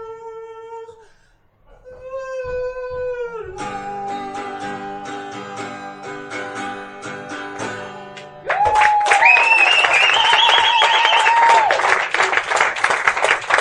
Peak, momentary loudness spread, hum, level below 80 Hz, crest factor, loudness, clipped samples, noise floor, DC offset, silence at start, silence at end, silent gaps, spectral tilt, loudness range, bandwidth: 0 dBFS; 21 LU; none; -52 dBFS; 18 dB; -14 LUFS; under 0.1%; -55 dBFS; under 0.1%; 0 s; 0 s; none; -1 dB/octave; 18 LU; 11.5 kHz